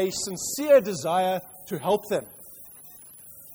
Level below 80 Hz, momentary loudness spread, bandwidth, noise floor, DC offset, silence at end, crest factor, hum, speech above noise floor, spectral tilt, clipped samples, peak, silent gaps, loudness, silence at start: -64 dBFS; 24 LU; over 20 kHz; -47 dBFS; under 0.1%; 0 s; 18 dB; none; 23 dB; -4 dB/octave; under 0.1%; -8 dBFS; none; -25 LUFS; 0 s